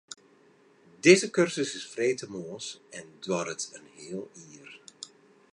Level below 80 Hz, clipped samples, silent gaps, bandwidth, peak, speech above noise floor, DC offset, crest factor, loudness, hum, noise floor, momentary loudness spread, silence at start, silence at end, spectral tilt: -78 dBFS; under 0.1%; none; 11 kHz; -6 dBFS; 32 dB; under 0.1%; 24 dB; -27 LUFS; none; -61 dBFS; 26 LU; 1.05 s; 0.45 s; -4 dB/octave